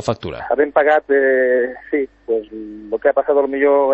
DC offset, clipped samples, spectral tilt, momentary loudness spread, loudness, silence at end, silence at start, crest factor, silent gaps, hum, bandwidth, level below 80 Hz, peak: under 0.1%; under 0.1%; -6.5 dB/octave; 10 LU; -17 LUFS; 0 s; 0 s; 16 dB; none; none; 8.4 kHz; -52 dBFS; -2 dBFS